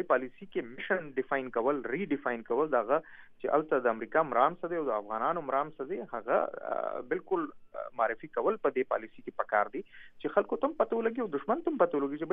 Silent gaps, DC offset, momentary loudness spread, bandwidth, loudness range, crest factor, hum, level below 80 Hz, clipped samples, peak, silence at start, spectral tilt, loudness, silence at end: none; under 0.1%; 9 LU; 3.8 kHz; 3 LU; 22 dB; none; -68 dBFS; under 0.1%; -10 dBFS; 0 s; -9 dB/octave; -32 LUFS; 0 s